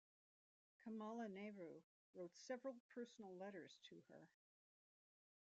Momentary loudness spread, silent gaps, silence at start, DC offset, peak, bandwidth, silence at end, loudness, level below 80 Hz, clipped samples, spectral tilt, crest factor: 13 LU; 1.84-2.13 s, 2.80-2.89 s; 0.8 s; under 0.1%; -40 dBFS; 8 kHz; 1.2 s; -56 LUFS; under -90 dBFS; under 0.1%; -4.5 dB/octave; 18 dB